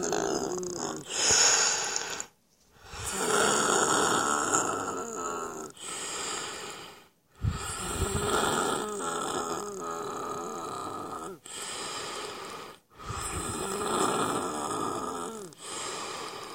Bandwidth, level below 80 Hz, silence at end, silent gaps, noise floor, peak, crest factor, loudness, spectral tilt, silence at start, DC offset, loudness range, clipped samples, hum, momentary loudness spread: 16.5 kHz; -50 dBFS; 0 s; none; -63 dBFS; -8 dBFS; 22 dB; -29 LUFS; -2 dB/octave; 0 s; under 0.1%; 10 LU; under 0.1%; none; 15 LU